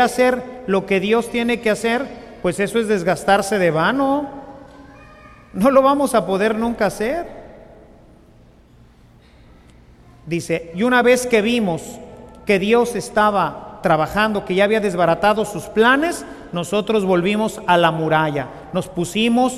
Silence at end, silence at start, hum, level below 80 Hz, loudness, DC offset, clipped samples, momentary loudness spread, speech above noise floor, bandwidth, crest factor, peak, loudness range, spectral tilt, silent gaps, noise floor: 0 s; 0 s; none; -48 dBFS; -18 LUFS; under 0.1%; under 0.1%; 11 LU; 31 dB; 15 kHz; 16 dB; -2 dBFS; 6 LU; -5 dB/octave; none; -48 dBFS